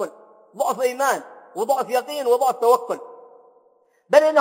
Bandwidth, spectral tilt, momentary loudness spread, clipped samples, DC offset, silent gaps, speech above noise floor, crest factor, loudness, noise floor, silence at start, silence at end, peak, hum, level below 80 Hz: 16.5 kHz; -2.5 dB/octave; 13 LU; under 0.1%; under 0.1%; none; 41 dB; 20 dB; -21 LUFS; -60 dBFS; 0 s; 0 s; 0 dBFS; none; -82 dBFS